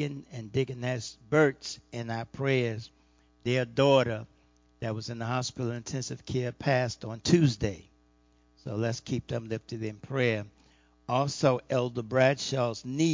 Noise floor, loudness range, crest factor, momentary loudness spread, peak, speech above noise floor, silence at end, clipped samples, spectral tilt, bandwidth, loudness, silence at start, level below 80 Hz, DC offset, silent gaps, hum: -64 dBFS; 4 LU; 20 dB; 13 LU; -8 dBFS; 36 dB; 0 s; under 0.1%; -5.5 dB/octave; 7.6 kHz; -30 LUFS; 0 s; -58 dBFS; under 0.1%; none; none